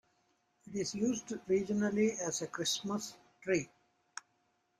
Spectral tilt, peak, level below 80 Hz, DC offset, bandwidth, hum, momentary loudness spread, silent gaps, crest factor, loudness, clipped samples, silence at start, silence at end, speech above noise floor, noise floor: -4 dB/octave; -18 dBFS; -72 dBFS; under 0.1%; 14.5 kHz; none; 18 LU; none; 18 dB; -35 LUFS; under 0.1%; 0.65 s; 1.15 s; 43 dB; -77 dBFS